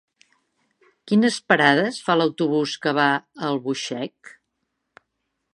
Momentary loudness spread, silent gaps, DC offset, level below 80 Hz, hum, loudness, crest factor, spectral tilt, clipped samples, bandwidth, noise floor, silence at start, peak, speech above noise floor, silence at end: 10 LU; none; under 0.1%; -74 dBFS; none; -21 LUFS; 22 dB; -4.5 dB/octave; under 0.1%; 11 kHz; -77 dBFS; 1.05 s; -2 dBFS; 56 dB; 1.25 s